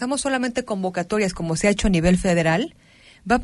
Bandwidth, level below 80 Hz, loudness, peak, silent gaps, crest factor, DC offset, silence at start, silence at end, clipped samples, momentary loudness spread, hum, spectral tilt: 11.5 kHz; -36 dBFS; -21 LUFS; -4 dBFS; none; 16 dB; under 0.1%; 0 s; 0 s; under 0.1%; 7 LU; none; -5 dB/octave